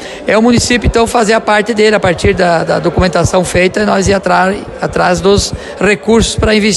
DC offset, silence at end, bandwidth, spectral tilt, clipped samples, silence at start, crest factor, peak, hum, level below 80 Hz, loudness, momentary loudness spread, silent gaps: under 0.1%; 0 s; 12.5 kHz; -4.5 dB/octave; under 0.1%; 0 s; 10 dB; 0 dBFS; none; -26 dBFS; -10 LUFS; 4 LU; none